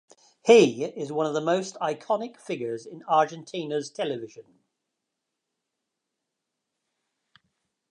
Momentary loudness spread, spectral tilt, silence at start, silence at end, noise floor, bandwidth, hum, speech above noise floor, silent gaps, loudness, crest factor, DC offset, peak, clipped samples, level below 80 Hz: 17 LU; -4.5 dB/octave; 0.45 s; 3.5 s; -83 dBFS; 10.5 kHz; none; 59 dB; none; -25 LUFS; 24 dB; under 0.1%; -4 dBFS; under 0.1%; -82 dBFS